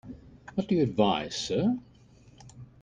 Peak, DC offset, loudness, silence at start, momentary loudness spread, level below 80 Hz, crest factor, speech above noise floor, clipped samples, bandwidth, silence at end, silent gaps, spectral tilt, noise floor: -10 dBFS; under 0.1%; -28 LUFS; 0.05 s; 23 LU; -58 dBFS; 22 dB; 29 dB; under 0.1%; 9.8 kHz; 0.15 s; none; -5.5 dB/octave; -56 dBFS